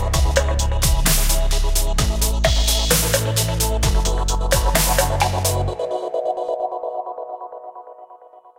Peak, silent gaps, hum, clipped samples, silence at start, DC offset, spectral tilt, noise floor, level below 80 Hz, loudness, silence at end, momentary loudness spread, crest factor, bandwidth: -2 dBFS; none; none; under 0.1%; 0 s; under 0.1%; -3.5 dB/octave; -45 dBFS; -22 dBFS; -19 LUFS; 0.4 s; 13 LU; 18 dB; 17 kHz